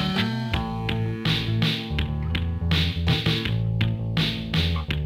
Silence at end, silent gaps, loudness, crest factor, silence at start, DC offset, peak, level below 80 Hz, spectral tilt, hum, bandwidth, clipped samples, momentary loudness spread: 0 s; none; -25 LUFS; 16 dB; 0 s; under 0.1%; -10 dBFS; -34 dBFS; -6 dB/octave; none; 16 kHz; under 0.1%; 4 LU